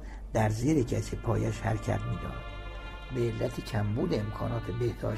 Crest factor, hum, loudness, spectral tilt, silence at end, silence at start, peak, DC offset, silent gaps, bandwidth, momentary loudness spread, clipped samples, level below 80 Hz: 16 dB; none; -31 LUFS; -7 dB/octave; 0 s; 0 s; -14 dBFS; under 0.1%; none; 13.5 kHz; 12 LU; under 0.1%; -42 dBFS